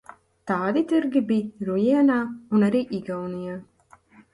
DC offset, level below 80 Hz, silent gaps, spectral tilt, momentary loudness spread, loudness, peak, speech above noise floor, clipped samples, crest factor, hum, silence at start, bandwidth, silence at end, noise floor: under 0.1%; -64 dBFS; none; -8 dB/octave; 13 LU; -23 LUFS; -10 dBFS; 31 dB; under 0.1%; 14 dB; none; 0.45 s; 11.5 kHz; 0.7 s; -54 dBFS